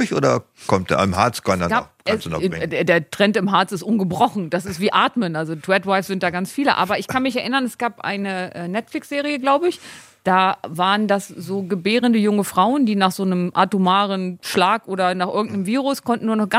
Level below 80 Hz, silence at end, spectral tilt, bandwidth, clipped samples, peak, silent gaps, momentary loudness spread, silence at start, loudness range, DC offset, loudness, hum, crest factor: -58 dBFS; 0 s; -5 dB/octave; 16 kHz; under 0.1%; -2 dBFS; none; 7 LU; 0 s; 3 LU; under 0.1%; -20 LUFS; none; 18 dB